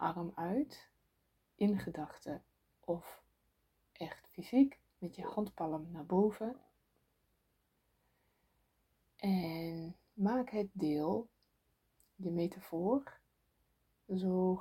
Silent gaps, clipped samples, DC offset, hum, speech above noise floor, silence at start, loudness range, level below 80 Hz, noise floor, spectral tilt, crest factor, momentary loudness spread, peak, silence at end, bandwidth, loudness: none; under 0.1%; under 0.1%; none; 43 dB; 0 s; 5 LU; -72 dBFS; -79 dBFS; -8.5 dB/octave; 22 dB; 15 LU; -18 dBFS; 0 s; 16.5 kHz; -38 LUFS